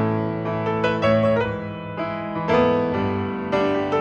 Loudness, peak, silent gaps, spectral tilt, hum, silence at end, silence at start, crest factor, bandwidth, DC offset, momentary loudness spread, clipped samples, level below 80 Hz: -22 LUFS; -6 dBFS; none; -8 dB/octave; none; 0 s; 0 s; 16 dB; 8.2 kHz; under 0.1%; 9 LU; under 0.1%; -48 dBFS